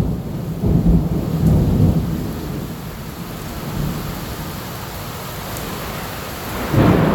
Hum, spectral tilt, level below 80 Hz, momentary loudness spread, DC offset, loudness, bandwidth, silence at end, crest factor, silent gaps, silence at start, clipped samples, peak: none; -7 dB/octave; -28 dBFS; 13 LU; under 0.1%; -21 LUFS; 19 kHz; 0 s; 18 dB; none; 0 s; under 0.1%; -2 dBFS